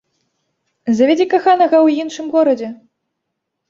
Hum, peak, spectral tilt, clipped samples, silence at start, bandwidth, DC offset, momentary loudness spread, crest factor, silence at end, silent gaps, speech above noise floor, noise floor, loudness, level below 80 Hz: none; -2 dBFS; -5 dB/octave; under 0.1%; 0.85 s; 7.6 kHz; under 0.1%; 10 LU; 14 dB; 0.95 s; none; 62 dB; -76 dBFS; -14 LUFS; -66 dBFS